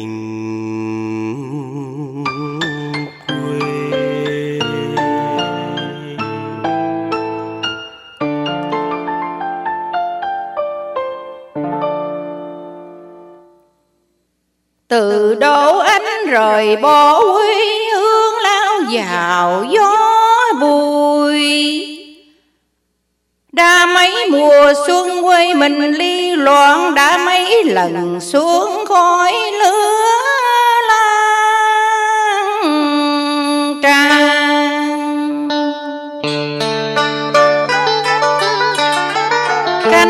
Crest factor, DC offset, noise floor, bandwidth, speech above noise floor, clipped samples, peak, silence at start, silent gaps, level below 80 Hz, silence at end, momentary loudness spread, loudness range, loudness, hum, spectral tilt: 14 dB; under 0.1%; -67 dBFS; 16 kHz; 56 dB; under 0.1%; 0 dBFS; 0 s; none; -60 dBFS; 0 s; 14 LU; 11 LU; -13 LUFS; none; -3.5 dB/octave